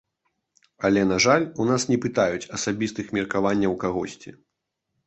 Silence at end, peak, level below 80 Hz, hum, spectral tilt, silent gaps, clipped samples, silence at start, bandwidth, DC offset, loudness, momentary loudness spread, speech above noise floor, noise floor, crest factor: 0.75 s; -4 dBFS; -54 dBFS; none; -4.5 dB/octave; none; under 0.1%; 0.8 s; 8.4 kHz; under 0.1%; -23 LUFS; 9 LU; 58 dB; -81 dBFS; 20 dB